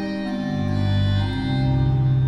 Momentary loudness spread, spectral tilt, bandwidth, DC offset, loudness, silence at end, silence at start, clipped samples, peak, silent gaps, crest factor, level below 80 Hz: 6 LU; -8.5 dB/octave; 6.2 kHz; under 0.1%; -22 LUFS; 0 s; 0 s; under 0.1%; -10 dBFS; none; 10 dB; -34 dBFS